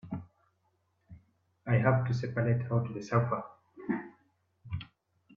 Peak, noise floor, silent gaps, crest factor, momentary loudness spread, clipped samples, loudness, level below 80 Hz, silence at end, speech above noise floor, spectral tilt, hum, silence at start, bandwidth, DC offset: -12 dBFS; -75 dBFS; none; 22 dB; 18 LU; under 0.1%; -32 LUFS; -64 dBFS; 0.5 s; 46 dB; -8.5 dB/octave; none; 0.05 s; 6.8 kHz; under 0.1%